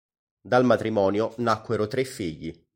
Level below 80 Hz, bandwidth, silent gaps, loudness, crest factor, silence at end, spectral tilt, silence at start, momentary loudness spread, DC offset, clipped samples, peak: -58 dBFS; 16.5 kHz; none; -24 LUFS; 18 dB; 0.2 s; -6.5 dB/octave; 0.45 s; 12 LU; under 0.1%; under 0.1%; -6 dBFS